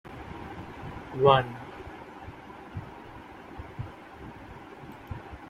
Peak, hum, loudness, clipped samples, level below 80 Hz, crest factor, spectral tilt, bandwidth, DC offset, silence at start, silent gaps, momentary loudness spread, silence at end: -6 dBFS; none; -30 LUFS; under 0.1%; -54 dBFS; 28 dB; -7 dB/octave; 14 kHz; under 0.1%; 0.05 s; none; 22 LU; 0 s